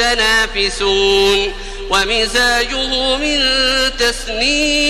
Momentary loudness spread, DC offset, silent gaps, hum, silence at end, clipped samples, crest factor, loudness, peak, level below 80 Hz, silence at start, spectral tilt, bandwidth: 5 LU; under 0.1%; none; none; 0 s; under 0.1%; 14 dB; -13 LUFS; 0 dBFS; -28 dBFS; 0 s; -1.5 dB/octave; 14 kHz